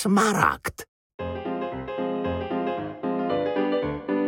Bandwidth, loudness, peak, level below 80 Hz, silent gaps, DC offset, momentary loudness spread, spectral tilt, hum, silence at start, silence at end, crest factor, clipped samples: 17 kHz; -26 LUFS; -2 dBFS; -50 dBFS; 0.88-1.18 s; under 0.1%; 13 LU; -5.5 dB/octave; none; 0 s; 0 s; 22 dB; under 0.1%